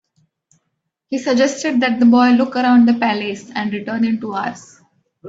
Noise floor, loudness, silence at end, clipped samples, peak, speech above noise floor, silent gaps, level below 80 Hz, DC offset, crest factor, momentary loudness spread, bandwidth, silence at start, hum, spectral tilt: -74 dBFS; -16 LUFS; 0 s; under 0.1%; -2 dBFS; 58 dB; none; -62 dBFS; under 0.1%; 14 dB; 12 LU; 7.8 kHz; 1.1 s; none; -5 dB/octave